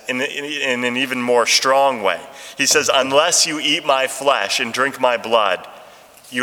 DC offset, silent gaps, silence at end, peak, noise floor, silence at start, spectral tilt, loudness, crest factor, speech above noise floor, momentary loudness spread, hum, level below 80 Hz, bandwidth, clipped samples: under 0.1%; none; 0 s; 0 dBFS; -43 dBFS; 0.05 s; -1 dB/octave; -17 LUFS; 18 dB; 26 dB; 8 LU; none; -70 dBFS; 19 kHz; under 0.1%